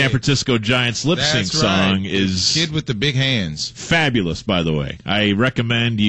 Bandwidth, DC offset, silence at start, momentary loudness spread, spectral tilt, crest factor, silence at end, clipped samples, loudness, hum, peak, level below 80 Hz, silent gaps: 9.2 kHz; 0.3%; 0 s; 5 LU; -4.5 dB/octave; 14 dB; 0 s; under 0.1%; -18 LUFS; none; -4 dBFS; -42 dBFS; none